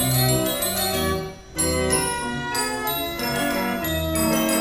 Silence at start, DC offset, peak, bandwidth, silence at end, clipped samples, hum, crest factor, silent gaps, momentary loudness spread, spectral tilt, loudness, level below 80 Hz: 0 s; under 0.1%; -8 dBFS; 17 kHz; 0 s; under 0.1%; none; 16 dB; none; 5 LU; -3.5 dB/octave; -22 LUFS; -40 dBFS